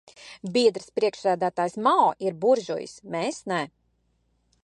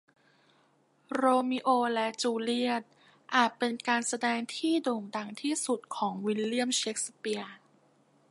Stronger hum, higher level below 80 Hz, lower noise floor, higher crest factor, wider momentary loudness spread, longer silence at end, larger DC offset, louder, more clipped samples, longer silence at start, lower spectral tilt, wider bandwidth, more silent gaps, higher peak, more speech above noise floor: neither; first, -70 dBFS vs -84 dBFS; about the same, -69 dBFS vs -68 dBFS; about the same, 18 dB vs 22 dB; first, 12 LU vs 9 LU; first, 0.95 s vs 0.75 s; neither; first, -25 LUFS vs -30 LUFS; neither; second, 0.2 s vs 1.1 s; first, -4.5 dB/octave vs -2.5 dB/octave; about the same, 11 kHz vs 11.5 kHz; neither; first, -6 dBFS vs -10 dBFS; first, 45 dB vs 38 dB